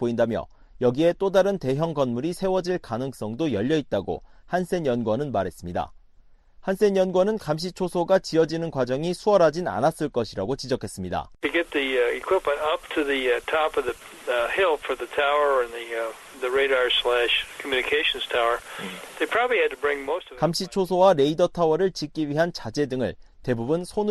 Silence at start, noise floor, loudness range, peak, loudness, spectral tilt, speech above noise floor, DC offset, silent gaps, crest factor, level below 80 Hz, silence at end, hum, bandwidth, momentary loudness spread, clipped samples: 0 s; -53 dBFS; 4 LU; -6 dBFS; -24 LUFS; -5 dB/octave; 29 dB; under 0.1%; none; 18 dB; -52 dBFS; 0 s; none; 12.5 kHz; 10 LU; under 0.1%